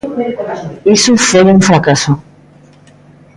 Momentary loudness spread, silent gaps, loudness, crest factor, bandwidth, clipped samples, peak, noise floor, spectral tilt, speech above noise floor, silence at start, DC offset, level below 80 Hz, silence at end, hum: 12 LU; none; -10 LUFS; 12 dB; 11.5 kHz; under 0.1%; 0 dBFS; -41 dBFS; -4.5 dB/octave; 32 dB; 0.05 s; under 0.1%; -44 dBFS; 1.15 s; none